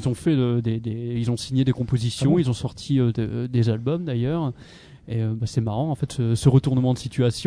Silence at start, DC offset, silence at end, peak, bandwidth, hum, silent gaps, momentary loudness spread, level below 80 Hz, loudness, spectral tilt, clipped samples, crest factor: 0 s; under 0.1%; 0 s; -4 dBFS; 11 kHz; none; none; 8 LU; -48 dBFS; -23 LUFS; -7.5 dB/octave; under 0.1%; 18 dB